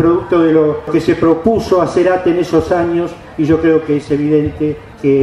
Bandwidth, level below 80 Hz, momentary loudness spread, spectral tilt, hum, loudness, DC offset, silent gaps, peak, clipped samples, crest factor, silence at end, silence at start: 11 kHz; -38 dBFS; 7 LU; -7.5 dB/octave; none; -13 LUFS; under 0.1%; none; 0 dBFS; under 0.1%; 12 dB; 0 s; 0 s